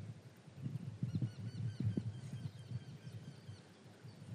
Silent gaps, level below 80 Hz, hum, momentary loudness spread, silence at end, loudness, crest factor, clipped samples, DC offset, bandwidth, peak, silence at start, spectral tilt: none; -78 dBFS; none; 17 LU; 0 s; -45 LUFS; 20 dB; under 0.1%; under 0.1%; 11 kHz; -24 dBFS; 0 s; -7.5 dB/octave